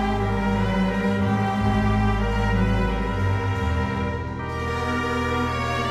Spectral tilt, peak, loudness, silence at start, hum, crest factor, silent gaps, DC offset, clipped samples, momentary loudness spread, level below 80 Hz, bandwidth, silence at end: -7 dB/octave; -10 dBFS; -23 LUFS; 0 s; 50 Hz at -40 dBFS; 12 dB; none; under 0.1%; under 0.1%; 5 LU; -30 dBFS; 13 kHz; 0 s